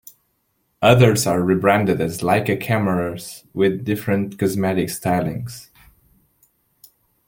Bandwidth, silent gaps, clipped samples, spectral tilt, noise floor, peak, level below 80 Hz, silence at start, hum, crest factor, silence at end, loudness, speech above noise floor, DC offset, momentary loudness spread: 17 kHz; none; under 0.1%; -6 dB/octave; -68 dBFS; -2 dBFS; -52 dBFS; 0.8 s; none; 20 dB; 1.65 s; -19 LUFS; 50 dB; under 0.1%; 13 LU